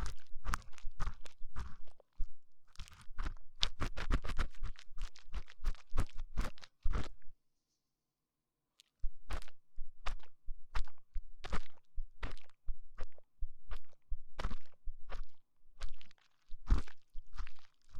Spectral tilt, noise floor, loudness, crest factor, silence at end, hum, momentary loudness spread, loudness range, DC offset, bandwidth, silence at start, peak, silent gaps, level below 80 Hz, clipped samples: -4.5 dB/octave; -89 dBFS; -47 LUFS; 24 dB; 0 s; none; 17 LU; 8 LU; under 0.1%; 9.2 kHz; 0 s; -10 dBFS; none; -42 dBFS; under 0.1%